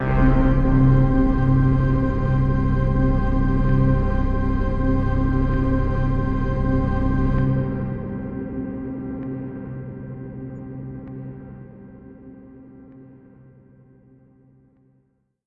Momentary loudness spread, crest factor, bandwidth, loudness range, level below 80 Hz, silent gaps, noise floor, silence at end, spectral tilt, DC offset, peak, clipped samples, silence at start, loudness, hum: 17 LU; 16 dB; 5 kHz; 18 LU; -26 dBFS; none; -65 dBFS; 2.4 s; -10.5 dB/octave; under 0.1%; -6 dBFS; under 0.1%; 0 s; -21 LUFS; none